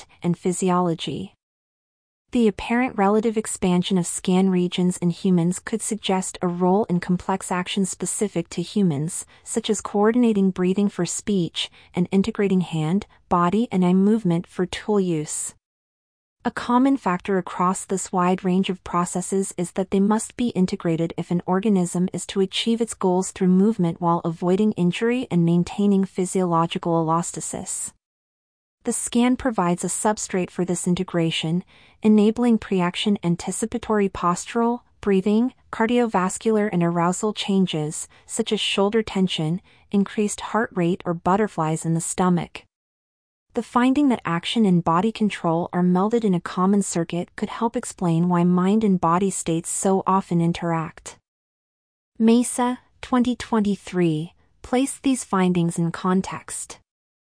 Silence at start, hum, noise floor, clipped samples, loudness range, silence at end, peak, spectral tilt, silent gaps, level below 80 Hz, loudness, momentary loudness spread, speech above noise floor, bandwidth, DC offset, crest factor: 0 s; none; under -90 dBFS; under 0.1%; 3 LU; 0.55 s; -6 dBFS; -5.5 dB/octave; 1.43-2.25 s, 15.65-16.36 s, 28.05-28.78 s, 42.75-43.46 s, 51.28-52.12 s; -54 dBFS; -22 LUFS; 8 LU; over 69 dB; 10.5 kHz; under 0.1%; 16 dB